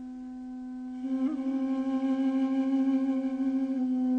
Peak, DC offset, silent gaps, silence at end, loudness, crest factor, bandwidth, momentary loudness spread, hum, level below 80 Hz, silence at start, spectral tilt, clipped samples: -20 dBFS; under 0.1%; none; 0 s; -29 LUFS; 10 dB; 5.4 kHz; 13 LU; none; -66 dBFS; 0 s; -6.5 dB/octave; under 0.1%